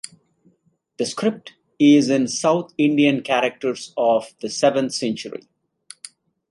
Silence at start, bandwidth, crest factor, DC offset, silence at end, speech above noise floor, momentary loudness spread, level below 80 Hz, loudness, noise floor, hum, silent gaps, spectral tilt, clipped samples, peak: 1 s; 11.5 kHz; 18 dB; under 0.1%; 1.15 s; 44 dB; 22 LU; -70 dBFS; -20 LUFS; -63 dBFS; none; none; -4.5 dB/octave; under 0.1%; -4 dBFS